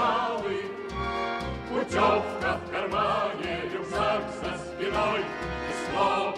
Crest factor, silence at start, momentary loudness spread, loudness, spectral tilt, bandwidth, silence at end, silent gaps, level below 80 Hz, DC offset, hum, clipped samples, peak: 16 dB; 0 s; 8 LU; -28 LUFS; -5 dB/octave; 12.5 kHz; 0 s; none; -48 dBFS; under 0.1%; none; under 0.1%; -12 dBFS